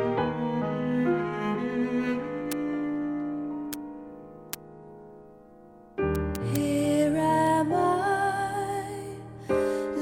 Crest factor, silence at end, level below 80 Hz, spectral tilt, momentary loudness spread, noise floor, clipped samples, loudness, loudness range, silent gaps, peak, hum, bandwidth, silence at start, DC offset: 24 dB; 0 s; -50 dBFS; -6 dB/octave; 16 LU; -51 dBFS; under 0.1%; -28 LUFS; 9 LU; none; -4 dBFS; none; 17 kHz; 0 s; under 0.1%